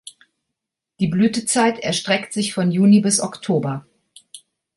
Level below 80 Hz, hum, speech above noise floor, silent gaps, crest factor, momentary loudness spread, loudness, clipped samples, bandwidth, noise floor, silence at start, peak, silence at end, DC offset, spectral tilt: -60 dBFS; none; 64 dB; none; 16 dB; 9 LU; -18 LUFS; under 0.1%; 11.5 kHz; -82 dBFS; 0.05 s; -4 dBFS; 0.4 s; under 0.1%; -4.5 dB/octave